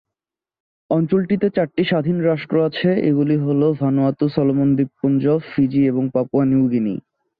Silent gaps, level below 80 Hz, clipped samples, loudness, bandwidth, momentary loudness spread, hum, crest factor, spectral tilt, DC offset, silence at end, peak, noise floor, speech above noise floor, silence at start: none; -56 dBFS; under 0.1%; -18 LUFS; 5 kHz; 3 LU; none; 14 dB; -11.5 dB/octave; under 0.1%; 0.4 s; -4 dBFS; -87 dBFS; 70 dB; 0.9 s